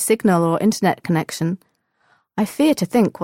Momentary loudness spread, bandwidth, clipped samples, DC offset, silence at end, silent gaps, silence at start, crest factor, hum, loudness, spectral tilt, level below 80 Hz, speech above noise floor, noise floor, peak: 8 LU; 17 kHz; under 0.1%; under 0.1%; 0 s; none; 0 s; 14 dB; none; -19 LUFS; -5.5 dB/octave; -60 dBFS; 44 dB; -62 dBFS; -6 dBFS